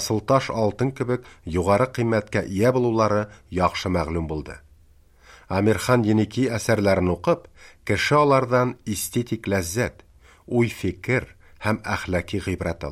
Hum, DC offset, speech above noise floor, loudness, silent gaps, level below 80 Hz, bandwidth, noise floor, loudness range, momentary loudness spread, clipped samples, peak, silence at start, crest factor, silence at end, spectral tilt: none; under 0.1%; 32 dB; -23 LUFS; none; -46 dBFS; 15.5 kHz; -54 dBFS; 5 LU; 9 LU; under 0.1%; -4 dBFS; 0 s; 18 dB; 0 s; -6 dB/octave